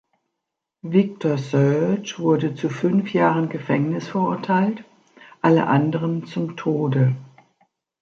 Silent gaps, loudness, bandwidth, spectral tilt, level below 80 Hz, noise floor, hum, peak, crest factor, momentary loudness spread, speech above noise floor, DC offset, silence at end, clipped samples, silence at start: none; -21 LUFS; 7.4 kHz; -8 dB/octave; -66 dBFS; -82 dBFS; none; -4 dBFS; 18 dB; 7 LU; 62 dB; under 0.1%; 0.75 s; under 0.1%; 0.85 s